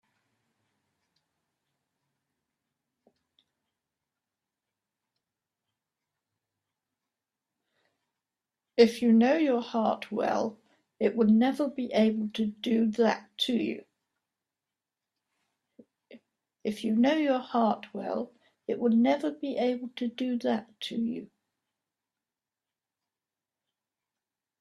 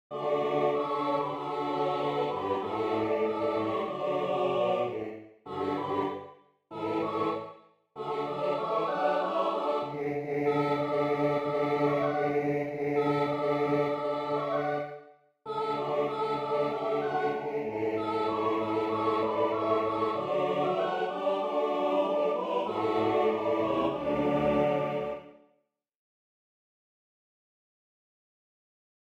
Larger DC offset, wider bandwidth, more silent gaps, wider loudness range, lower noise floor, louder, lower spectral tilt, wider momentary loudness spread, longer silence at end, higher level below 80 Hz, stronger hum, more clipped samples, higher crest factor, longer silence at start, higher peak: neither; first, 12 kHz vs 8.8 kHz; neither; first, 11 LU vs 4 LU; first, under -90 dBFS vs -75 dBFS; about the same, -28 LUFS vs -30 LUFS; second, -6 dB/octave vs -7.5 dB/octave; first, 12 LU vs 6 LU; second, 3.35 s vs 3.75 s; second, -76 dBFS vs -66 dBFS; neither; neither; first, 24 dB vs 16 dB; first, 8.75 s vs 0.1 s; first, -8 dBFS vs -14 dBFS